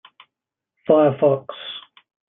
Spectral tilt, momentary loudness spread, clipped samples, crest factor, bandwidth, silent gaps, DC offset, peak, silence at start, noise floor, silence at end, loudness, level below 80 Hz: -11 dB/octave; 19 LU; under 0.1%; 18 dB; 3.9 kHz; none; under 0.1%; -2 dBFS; 0.9 s; -85 dBFS; 0.5 s; -18 LUFS; -70 dBFS